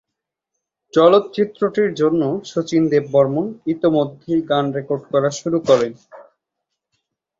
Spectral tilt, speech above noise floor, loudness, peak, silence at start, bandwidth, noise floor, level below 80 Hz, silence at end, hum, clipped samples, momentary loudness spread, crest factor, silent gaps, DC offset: -6.5 dB/octave; 65 dB; -18 LUFS; -2 dBFS; 0.95 s; 7.8 kHz; -82 dBFS; -60 dBFS; 1.2 s; none; under 0.1%; 8 LU; 18 dB; none; under 0.1%